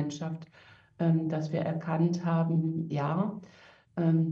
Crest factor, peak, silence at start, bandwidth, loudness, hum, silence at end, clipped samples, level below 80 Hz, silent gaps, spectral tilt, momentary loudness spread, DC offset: 14 dB; -16 dBFS; 0 s; 7 kHz; -30 LUFS; none; 0 s; under 0.1%; -72 dBFS; none; -8.5 dB/octave; 11 LU; under 0.1%